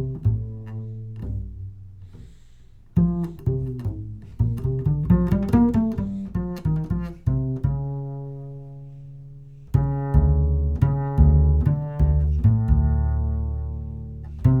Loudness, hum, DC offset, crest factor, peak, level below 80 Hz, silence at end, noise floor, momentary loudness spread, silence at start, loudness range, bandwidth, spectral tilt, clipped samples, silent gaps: -23 LUFS; none; under 0.1%; 18 dB; -4 dBFS; -26 dBFS; 0 s; -47 dBFS; 19 LU; 0 s; 8 LU; 3 kHz; -11 dB/octave; under 0.1%; none